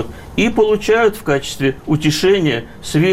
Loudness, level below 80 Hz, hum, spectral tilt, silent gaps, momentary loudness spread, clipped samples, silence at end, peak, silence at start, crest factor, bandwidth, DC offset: -16 LUFS; -38 dBFS; none; -5.5 dB/octave; none; 6 LU; under 0.1%; 0 s; -4 dBFS; 0 s; 10 dB; 16 kHz; under 0.1%